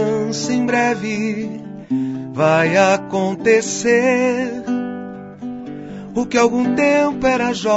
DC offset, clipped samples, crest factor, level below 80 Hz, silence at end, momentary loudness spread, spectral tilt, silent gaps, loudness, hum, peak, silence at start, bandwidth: under 0.1%; under 0.1%; 16 dB; -52 dBFS; 0 s; 16 LU; -5 dB/octave; none; -17 LUFS; none; -2 dBFS; 0 s; 8 kHz